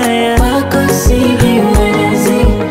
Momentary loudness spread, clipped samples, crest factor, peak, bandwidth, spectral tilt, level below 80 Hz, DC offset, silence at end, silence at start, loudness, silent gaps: 2 LU; under 0.1%; 10 dB; 0 dBFS; 16.5 kHz; -5.5 dB/octave; -16 dBFS; under 0.1%; 0 s; 0 s; -11 LUFS; none